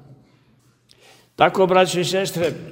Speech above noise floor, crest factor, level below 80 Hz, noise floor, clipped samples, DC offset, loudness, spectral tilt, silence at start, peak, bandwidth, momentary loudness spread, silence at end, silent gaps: 39 dB; 22 dB; -60 dBFS; -58 dBFS; under 0.1%; under 0.1%; -18 LUFS; -4.5 dB/octave; 1.4 s; 0 dBFS; 16 kHz; 7 LU; 0 s; none